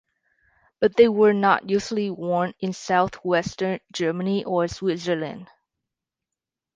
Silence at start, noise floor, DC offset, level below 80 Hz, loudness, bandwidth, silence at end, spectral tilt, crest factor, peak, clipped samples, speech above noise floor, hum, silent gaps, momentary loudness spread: 0.8 s; -87 dBFS; under 0.1%; -58 dBFS; -23 LUFS; 9.4 kHz; 1.3 s; -5.5 dB/octave; 20 dB; -4 dBFS; under 0.1%; 65 dB; none; none; 10 LU